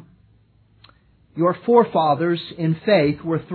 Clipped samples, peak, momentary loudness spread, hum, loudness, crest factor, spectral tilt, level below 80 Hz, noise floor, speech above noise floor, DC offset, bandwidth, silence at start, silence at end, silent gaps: under 0.1%; -2 dBFS; 8 LU; none; -19 LUFS; 18 dB; -10.5 dB/octave; -58 dBFS; -56 dBFS; 37 dB; under 0.1%; 4.5 kHz; 1.35 s; 0 s; none